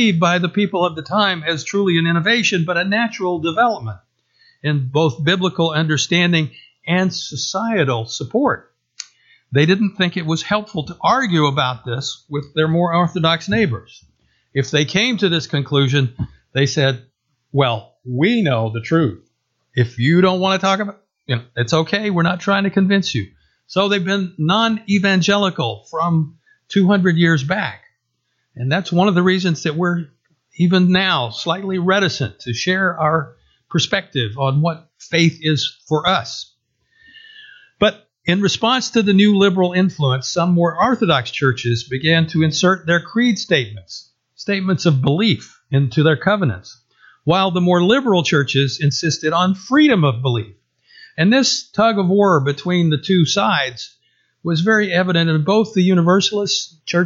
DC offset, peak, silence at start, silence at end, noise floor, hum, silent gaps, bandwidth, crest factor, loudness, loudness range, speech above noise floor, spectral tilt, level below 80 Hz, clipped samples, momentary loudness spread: under 0.1%; -2 dBFS; 0 s; 0 s; -70 dBFS; none; none; 7.6 kHz; 16 dB; -17 LUFS; 3 LU; 54 dB; -5.5 dB/octave; -56 dBFS; under 0.1%; 10 LU